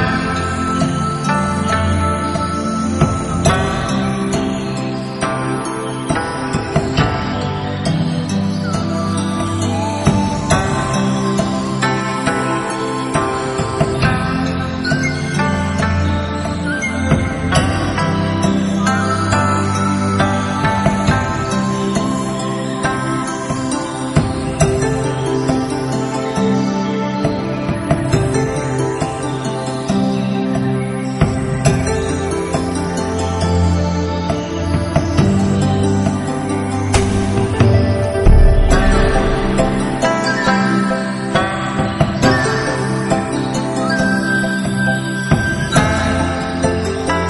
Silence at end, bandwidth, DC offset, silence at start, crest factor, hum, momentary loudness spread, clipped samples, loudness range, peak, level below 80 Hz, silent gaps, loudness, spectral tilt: 0 s; 11.5 kHz; under 0.1%; 0 s; 16 dB; none; 5 LU; under 0.1%; 3 LU; 0 dBFS; -26 dBFS; none; -17 LUFS; -5.5 dB/octave